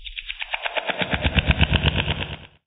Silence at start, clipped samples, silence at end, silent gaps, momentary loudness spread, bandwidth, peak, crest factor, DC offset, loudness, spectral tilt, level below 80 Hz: 0 s; under 0.1%; 0.2 s; none; 11 LU; 4.3 kHz; 0 dBFS; 24 dB; under 0.1%; -23 LUFS; -3 dB/octave; -30 dBFS